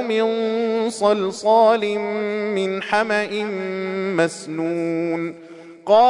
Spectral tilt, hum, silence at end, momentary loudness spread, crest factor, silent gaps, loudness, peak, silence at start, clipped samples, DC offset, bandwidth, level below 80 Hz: -5 dB/octave; none; 0 s; 9 LU; 16 dB; none; -21 LUFS; -4 dBFS; 0 s; under 0.1%; under 0.1%; 11 kHz; -68 dBFS